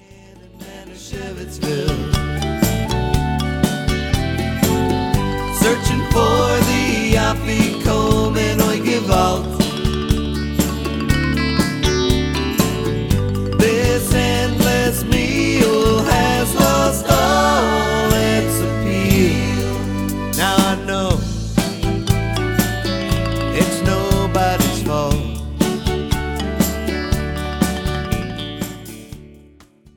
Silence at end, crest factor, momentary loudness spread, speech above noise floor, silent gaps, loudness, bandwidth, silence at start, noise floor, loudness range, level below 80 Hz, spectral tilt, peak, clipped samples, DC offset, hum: 0.6 s; 18 dB; 7 LU; 28 dB; none; -18 LUFS; 19 kHz; 0.1 s; -47 dBFS; 5 LU; -26 dBFS; -5 dB/octave; 0 dBFS; under 0.1%; under 0.1%; none